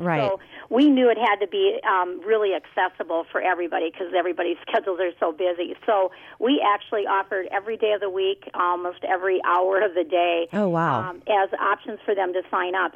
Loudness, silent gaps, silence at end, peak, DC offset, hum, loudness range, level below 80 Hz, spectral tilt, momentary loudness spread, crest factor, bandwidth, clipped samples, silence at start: -23 LUFS; none; 0.05 s; -10 dBFS; under 0.1%; none; 3 LU; -70 dBFS; -7.5 dB/octave; 6 LU; 12 dB; 7 kHz; under 0.1%; 0 s